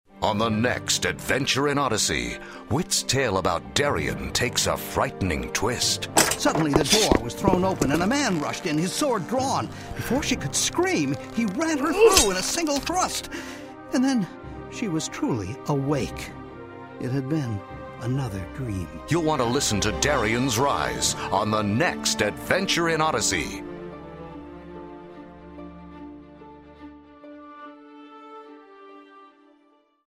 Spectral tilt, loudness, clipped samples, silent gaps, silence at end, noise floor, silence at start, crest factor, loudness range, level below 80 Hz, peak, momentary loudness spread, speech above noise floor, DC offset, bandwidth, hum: -3.5 dB/octave; -24 LUFS; under 0.1%; none; 0.8 s; -61 dBFS; 0.15 s; 24 dB; 16 LU; -44 dBFS; -2 dBFS; 19 LU; 37 dB; under 0.1%; 16 kHz; none